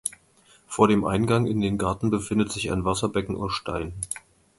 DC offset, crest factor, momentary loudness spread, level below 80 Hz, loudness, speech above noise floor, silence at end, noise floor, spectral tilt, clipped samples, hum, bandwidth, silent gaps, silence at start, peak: under 0.1%; 22 dB; 12 LU; -46 dBFS; -25 LUFS; 34 dB; 0.4 s; -58 dBFS; -5.5 dB/octave; under 0.1%; none; 12 kHz; none; 0.05 s; -2 dBFS